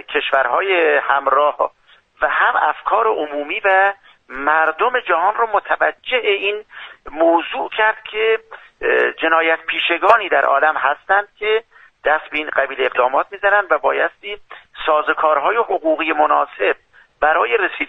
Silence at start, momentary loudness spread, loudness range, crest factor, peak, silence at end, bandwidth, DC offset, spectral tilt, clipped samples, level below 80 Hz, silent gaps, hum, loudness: 0.1 s; 8 LU; 2 LU; 18 dB; 0 dBFS; 0 s; 5.8 kHz; under 0.1%; -4 dB/octave; under 0.1%; -54 dBFS; none; none; -17 LUFS